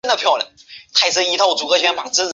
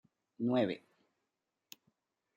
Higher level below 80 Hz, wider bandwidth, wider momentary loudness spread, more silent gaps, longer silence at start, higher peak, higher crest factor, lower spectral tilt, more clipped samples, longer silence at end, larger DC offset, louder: first, -66 dBFS vs -84 dBFS; second, 8.2 kHz vs 13 kHz; second, 4 LU vs 24 LU; neither; second, 0.05 s vs 0.4 s; first, -2 dBFS vs -20 dBFS; about the same, 16 dB vs 20 dB; second, 0.5 dB/octave vs -7 dB/octave; neither; second, 0 s vs 1.6 s; neither; first, -16 LUFS vs -35 LUFS